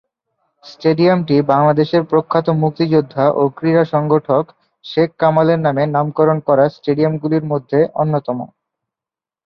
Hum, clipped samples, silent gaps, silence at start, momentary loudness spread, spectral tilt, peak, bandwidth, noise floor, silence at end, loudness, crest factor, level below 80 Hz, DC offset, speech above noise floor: none; under 0.1%; none; 0.65 s; 5 LU; -9.5 dB/octave; -2 dBFS; 6 kHz; -89 dBFS; 1 s; -15 LUFS; 14 dB; -58 dBFS; under 0.1%; 74 dB